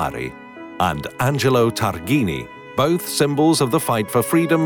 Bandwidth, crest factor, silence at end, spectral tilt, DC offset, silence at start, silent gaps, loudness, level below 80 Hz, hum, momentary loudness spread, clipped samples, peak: over 20 kHz; 14 dB; 0 s; -5 dB/octave; under 0.1%; 0 s; none; -19 LUFS; -48 dBFS; none; 12 LU; under 0.1%; -6 dBFS